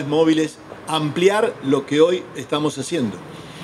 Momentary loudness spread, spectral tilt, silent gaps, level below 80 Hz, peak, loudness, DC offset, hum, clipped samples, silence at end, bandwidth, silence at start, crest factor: 10 LU; -5 dB/octave; none; -60 dBFS; -2 dBFS; -20 LUFS; under 0.1%; none; under 0.1%; 0 s; 13 kHz; 0 s; 16 dB